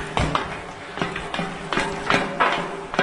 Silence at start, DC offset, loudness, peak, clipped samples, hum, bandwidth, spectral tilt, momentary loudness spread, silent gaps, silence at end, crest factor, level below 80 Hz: 0 s; under 0.1%; -24 LUFS; -4 dBFS; under 0.1%; none; 11 kHz; -4.5 dB/octave; 9 LU; none; 0 s; 20 dB; -40 dBFS